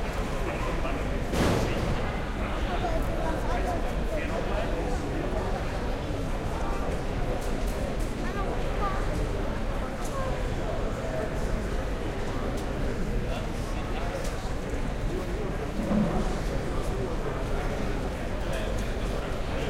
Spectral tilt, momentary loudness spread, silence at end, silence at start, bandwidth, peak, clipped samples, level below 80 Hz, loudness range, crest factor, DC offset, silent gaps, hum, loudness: -6 dB/octave; 4 LU; 0 s; 0 s; 15.5 kHz; -12 dBFS; under 0.1%; -32 dBFS; 3 LU; 16 dB; under 0.1%; none; none; -31 LUFS